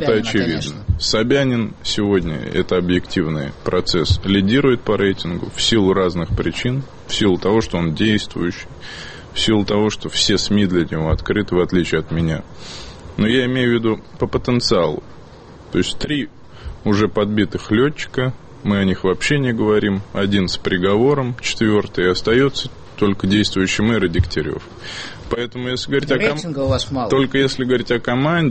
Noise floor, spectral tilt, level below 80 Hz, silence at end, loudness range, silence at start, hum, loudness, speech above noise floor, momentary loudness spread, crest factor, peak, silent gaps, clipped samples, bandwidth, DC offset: -39 dBFS; -5.5 dB/octave; -36 dBFS; 0 s; 3 LU; 0 s; none; -18 LUFS; 22 dB; 9 LU; 14 dB; -4 dBFS; none; under 0.1%; 8.8 kHz; under 0.1%